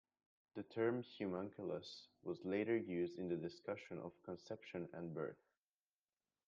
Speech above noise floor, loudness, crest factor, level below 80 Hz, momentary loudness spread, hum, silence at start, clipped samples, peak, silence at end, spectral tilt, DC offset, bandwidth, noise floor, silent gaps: over 45 dB; -46 LUFS; 18 dB; -86 dBFS; 11 LU; none; 0.55 s; under 0.1%; -28 dBFS; 1.15 s; -7 dB/octave; under 0.1%; 7.4 kHz; under -90 dBFS; none